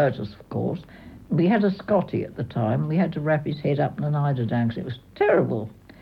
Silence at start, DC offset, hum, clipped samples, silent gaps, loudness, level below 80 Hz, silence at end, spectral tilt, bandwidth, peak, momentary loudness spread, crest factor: 0 s; under 0.1%; none; under 0.1%; none; -24 LUFS; -56 dBFS; 0.3 s; -10 dB/octave; 5.4 kHz; -8 dBFS; 11 LU; 16 dB